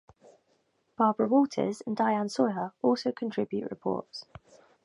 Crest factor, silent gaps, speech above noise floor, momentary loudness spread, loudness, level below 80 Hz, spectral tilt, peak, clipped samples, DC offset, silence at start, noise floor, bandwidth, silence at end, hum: 20 dB; none; 43 dB; 9 LU; -29 LUFS; -72 dBFS; -6 dB/octave; -10 dBFS; under 0.1%; under 0.1%; 1 s; -72 dBFS; 11 kHz; 0.65 s; none